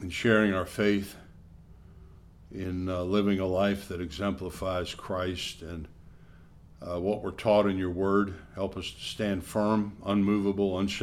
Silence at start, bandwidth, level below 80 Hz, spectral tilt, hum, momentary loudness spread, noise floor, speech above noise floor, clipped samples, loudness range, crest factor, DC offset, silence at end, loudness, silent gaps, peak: 0 s; 15 kHz; -52 dBFS; -6 dB/octave; none; 13 LU; -52 dBFS; 24 dB; under 0.1%; 5 LU; 22 dB; under 0.1%; 0 s; -29 LUFS; none; -8 dBFS